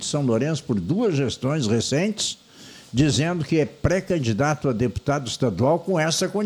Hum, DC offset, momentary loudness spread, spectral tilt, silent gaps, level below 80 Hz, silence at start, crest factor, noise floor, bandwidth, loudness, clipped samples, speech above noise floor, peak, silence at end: none; under 0.1%; 5 LU; -5 dB/octave; none; -44 dBFS; 0 s; 18 dB; -44 dBFS; 19 kHz; -23 LUFS; under 0.1%; 22 dB; -6 dBFS; 0 s